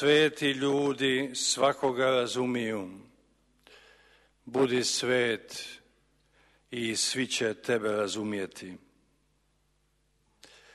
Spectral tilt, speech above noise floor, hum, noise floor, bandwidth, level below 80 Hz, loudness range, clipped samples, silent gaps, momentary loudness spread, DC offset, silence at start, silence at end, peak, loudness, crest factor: -3 dB/octave; 43 dB; none; -71 dBFS; 12.5 kHz; -70 dBFS; 4 LU; under 0.1%; none; 14 LU; under 0.1%; 0 s; 1.95 s; -12 dBFS; -28 LUFS; 20 dB